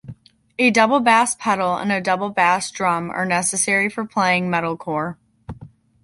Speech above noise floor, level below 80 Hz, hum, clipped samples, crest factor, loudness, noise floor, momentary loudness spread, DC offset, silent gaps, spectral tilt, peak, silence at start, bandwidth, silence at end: 25 dB; -54 dBFS; none; under 0.1%; 18 dB; -19 LUFS; -44 dBFS; 14 LU; under 0.1%; none; -3.5 dB/octave; -2 dBFS; 0.05 s; 11.5 kHz; 0.35 s